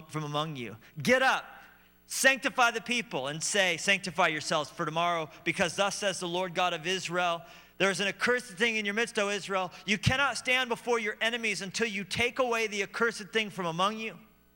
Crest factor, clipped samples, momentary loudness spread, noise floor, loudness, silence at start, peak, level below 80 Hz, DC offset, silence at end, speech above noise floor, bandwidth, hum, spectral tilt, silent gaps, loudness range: 20 dB; under 0.1%; 8 LU; -56 dBFS; -29 LUFS; 0 s; -10 dBFS; -62 dBFS; under 0.1%; 0.35 s; 27 dB; 16 kHz; 60 Hz at -65 dBFS; -3 dB/octave; none; 2 LU